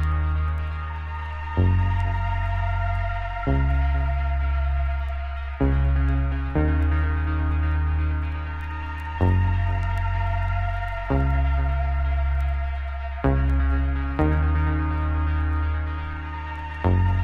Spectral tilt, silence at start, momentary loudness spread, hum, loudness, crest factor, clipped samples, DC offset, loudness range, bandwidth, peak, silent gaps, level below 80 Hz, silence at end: -9.5 dB/octave; 0 s; 9 LU; none; -25 LUFS; 14 dB; under 0.1%; under 0.1%; 1 LU; 4.4 kHz; -8 dBFS; none; -24 dBFS; 0 s